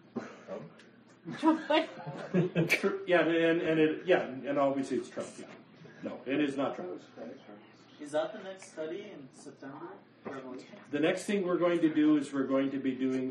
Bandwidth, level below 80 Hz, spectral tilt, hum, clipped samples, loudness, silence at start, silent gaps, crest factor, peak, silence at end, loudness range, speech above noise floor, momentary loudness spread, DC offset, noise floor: 11 kHz; -80 dBFS; -6 dB/octave; none; under 0.1%; -31 LUFS; 0.15 s; none; 18 dB; -14 dBFS; 0 s; 12 LU; 26 dB; 20 LU; under 0.1%; -57 dBFS